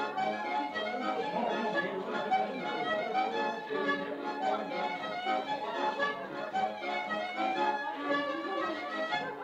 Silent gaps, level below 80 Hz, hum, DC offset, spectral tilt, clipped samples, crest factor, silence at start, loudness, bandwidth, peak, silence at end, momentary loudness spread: none; -76 dBFS; none; under 0.1%; -4.5 dB/octave; under 0.1%; 16 dB; 0 s; -33 LUFS; 9.8 kHz; -18 dBFS; 0 s; 4 LU